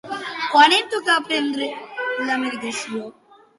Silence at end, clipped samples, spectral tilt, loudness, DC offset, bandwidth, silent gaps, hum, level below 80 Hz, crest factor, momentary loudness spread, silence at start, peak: 0.5 s; under 0.1%; -1.5 dB/octave; -20 LUFS; under 0.1%; 11.5 kHz; none; none; -72 dBFS; 18 dB; 15 LU; 0.05 s; -2 dBFS